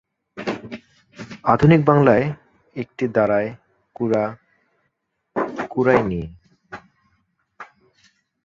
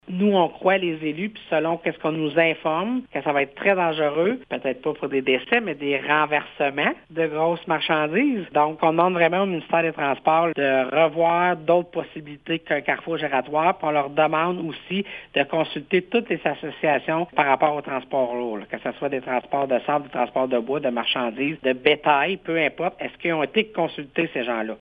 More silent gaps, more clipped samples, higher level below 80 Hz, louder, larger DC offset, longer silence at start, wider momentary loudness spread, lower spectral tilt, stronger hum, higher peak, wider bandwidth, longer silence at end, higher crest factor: neither; neither; first, -50 dBFS vs -64 dBFS; first, -20 LUFS vs -23 LUFS; neither; first, 0.35 s vs 0.05 s; first, 25 LU vs 8 LU; about the same, -8.5 dB/octave vs -8 dB/octave; neither; about the same, -2 dBFS vs 0 dBFS; first, 7.4 kHz vs 4.9 kHz; first, 0.8 s vs 0.05 s; about the same, 20 dB vs 22 dB